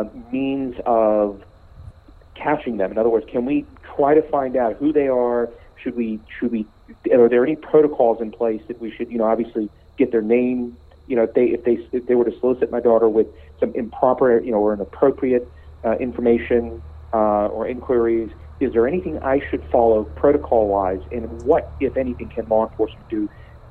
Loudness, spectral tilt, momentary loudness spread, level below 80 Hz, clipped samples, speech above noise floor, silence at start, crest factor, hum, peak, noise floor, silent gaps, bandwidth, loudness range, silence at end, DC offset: -20 LUFS; -9.5 dB/octave; 11 LU; -42 dBFS; under 0.1%; 25 dB; 0 s; 18 dB; none; -2 dBFS; -45 dBFS; none; 4.3 kHz; 3 LU; 0 s; under 0.1%